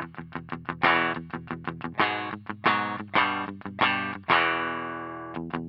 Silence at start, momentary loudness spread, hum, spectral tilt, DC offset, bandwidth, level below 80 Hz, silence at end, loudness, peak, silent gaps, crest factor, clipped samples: 0 s; 14 LU; none; -7 dB/octave; under 0.1%; 5.8 kHz; -64 dBFS; 0 s; -27 LUFS; -8 dBFS; none; 20 dB; under 0.1%